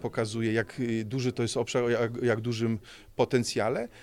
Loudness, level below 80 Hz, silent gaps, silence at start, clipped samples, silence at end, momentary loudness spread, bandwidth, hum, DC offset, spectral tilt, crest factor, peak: -29 LUFS; -60 dBFS; none; 0 s; under 0.1%; 0 s; 5 LU; 15 kHz; none; under 0.1%; -5.5 dB/octave; 18 dB; -12 dBFS